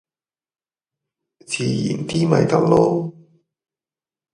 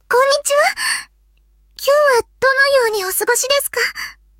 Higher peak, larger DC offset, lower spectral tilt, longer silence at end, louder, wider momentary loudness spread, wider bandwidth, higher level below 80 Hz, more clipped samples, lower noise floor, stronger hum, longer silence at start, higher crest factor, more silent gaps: about the same, 0 dBFS vs -2 dBFS; neither; first, -6.5 dB/octave vs 0.5 dB/octave; first, 1.25 s vs 0.3 s; second, -19 LUFS vs -15 LUFS; first, 10 LU vs 7 LU; second, 11.5 kHz vs 17 kHz; about the same, -56 dBFS vs -54 dBFS; neither; first, under -90 dBFS vs -54 dBFS; neither; first, 1.5 s vs 0.1 s; first, 22 dB vs 14 dB; neither